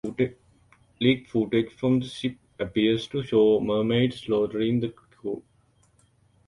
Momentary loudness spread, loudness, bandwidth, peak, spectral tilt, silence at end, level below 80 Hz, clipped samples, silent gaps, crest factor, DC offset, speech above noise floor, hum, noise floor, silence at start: 13 LU; -25 LUFS; 11 kHz; -6 dBFS; -7 dB/octave; 1.1 s; -58 dBFS; under 0.1%; none; 20 dB; under 0.1%; 39 dB; none; -63 dBFS; 0.05 s